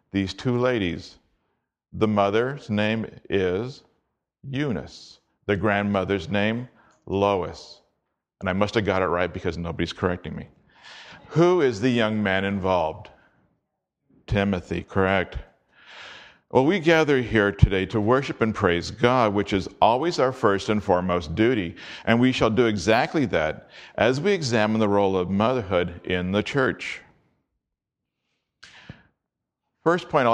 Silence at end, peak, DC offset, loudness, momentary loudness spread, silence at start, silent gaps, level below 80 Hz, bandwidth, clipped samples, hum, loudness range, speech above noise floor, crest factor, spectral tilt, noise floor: 0 s; 0 dBFS; under 0.1%; -23 LUFS; 13 LU; 0.15 s; none; -44 dBFS; 10 kHz; under 0.1%; none; 6 LU; 61 dB; 24 dB; -6.5 dB/octave; -84 dBFS